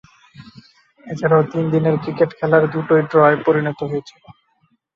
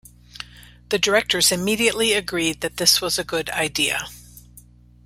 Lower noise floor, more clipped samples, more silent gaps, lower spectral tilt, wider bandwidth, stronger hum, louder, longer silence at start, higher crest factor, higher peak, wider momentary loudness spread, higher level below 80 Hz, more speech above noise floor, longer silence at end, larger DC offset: first, -63 dBFS vs -48 dBFS; neither; neither; first, -8.5 dB/octave vs -1.5 dB/octave; second, 6.8 kHz vs 16 kHz; second, none vs 60 Hz at -45 dBFS; about the same, -17 LUFS vs -19 LUFS; about the same, 0.4 s vs 0.35 s; second, 16 dB vs 22 dB; about the same, -2 dBFS vs -2 dBFS; second, 11 LU vs 20 LU; second, -58 dBFS vs -50 dBFS; first, 47 dB vs 27 dB; first, 0.65 s vs 0.45 s; neither